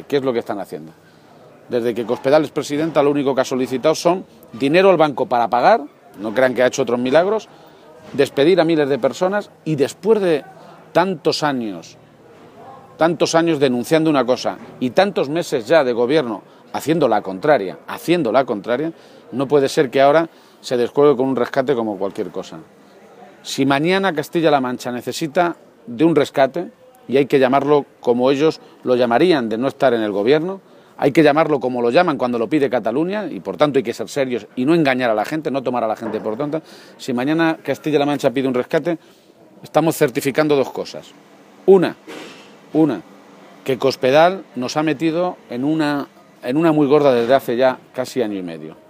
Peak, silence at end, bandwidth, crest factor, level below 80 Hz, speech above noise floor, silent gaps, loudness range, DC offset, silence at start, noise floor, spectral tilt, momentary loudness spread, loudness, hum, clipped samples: 0 dBFS; 0.15 s; 15.5 kHz; 18 dB; -66 dBFS; 28 dB; none; 4 LU; under 0.1%; 0 s; -45 dBFS; -5.5 dB/octave; 13 LU; -18 LUFS; none; under 0.1%